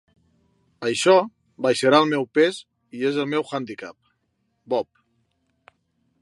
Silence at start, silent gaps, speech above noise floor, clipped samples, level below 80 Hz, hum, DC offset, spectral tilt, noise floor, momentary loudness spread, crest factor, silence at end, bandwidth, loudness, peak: 0.8 s; none; 51 dB; under 0.1%; -72 dBFS; none; under 0.1%; -4.5 dB/octave; -72 dBFS; 20 LU; 22 dB; 1.4 s; 11.5 kHz; -21 LUFS; -2 dBFS